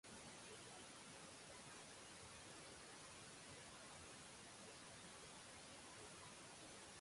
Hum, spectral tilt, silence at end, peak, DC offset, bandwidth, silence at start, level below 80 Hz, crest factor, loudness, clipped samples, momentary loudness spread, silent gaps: none; -2 dB/octave; 0 s; -46 dBFS; under 0.1%; 11.5 kHz; 0.05 s; -78 dBFS; 14 dB; -58 LUFS; under 0.1%; 1 LU; none